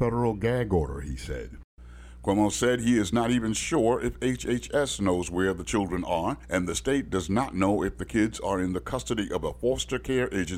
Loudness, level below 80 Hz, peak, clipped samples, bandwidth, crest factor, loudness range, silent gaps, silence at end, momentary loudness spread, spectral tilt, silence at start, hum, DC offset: -27 LUFS; -42 dBFS; -12 dBFS; under 0.1%; 16 kHz; 14 dB; 2 LU; 1.64-1.77 s; 0 s; 6 LU; -5 dB/octave; 0 s; none; under 0.1%